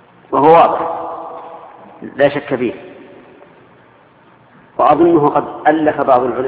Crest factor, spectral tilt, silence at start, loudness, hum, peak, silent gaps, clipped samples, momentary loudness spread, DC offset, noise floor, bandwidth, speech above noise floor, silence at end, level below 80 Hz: 16 dB; -10 dB/octave; 0.3 s; -13 LUFS; none; 0 dBFS; none; under 0.1%; 22 LU; under 0.1%; -47 dBFS; 4.9 kHz; 34 dB; 0 s; -54 dBFS